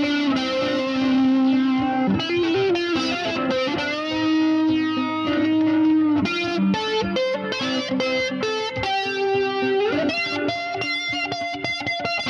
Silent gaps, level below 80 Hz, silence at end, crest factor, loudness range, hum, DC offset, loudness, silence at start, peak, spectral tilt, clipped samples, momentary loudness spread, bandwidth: none; -54 dBFS; 0 s; 12 dB; 2 LU; none; under 0.1%; -22 LUFS; 0 s; -8 dBFS; -5 dB/octave; under 0.1%; 5 LU; 9.6 kHz